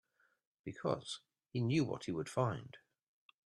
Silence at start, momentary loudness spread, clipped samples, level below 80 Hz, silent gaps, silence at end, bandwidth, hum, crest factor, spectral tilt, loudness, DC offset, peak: 0.65 s; 15 LU; under 0.1%; -74 dBFS; none; 0.7 s; 11.5 kHz; none; 20 dB; -6.5 dB/octave; -39 LUFS; under 0.1%; -22 dBFS